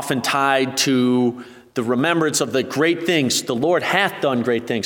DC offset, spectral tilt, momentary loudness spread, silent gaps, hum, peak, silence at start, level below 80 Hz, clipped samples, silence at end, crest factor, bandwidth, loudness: under 0.1%; -3.5 dB/octave; 5 LU; none; none; -2 dBFS; 0 s; -64 dBFS; under 0.1%; 0 s; 18 dB; 19 kHz; -19 LUFS